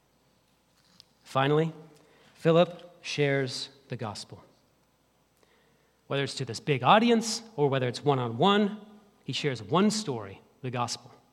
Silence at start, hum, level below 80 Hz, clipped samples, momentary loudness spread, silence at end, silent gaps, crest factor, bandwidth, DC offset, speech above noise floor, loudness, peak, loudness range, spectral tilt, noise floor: 1.25 s; none; -76 dBFS; under 0.1%; 15 LU; 0.35 s; none; 22 dB; 13.5 kHz; under 0.1%; 41 dB; -28 LUFS; -6 dBFS; 8 LU; -5 dB/octave; -68 dBFS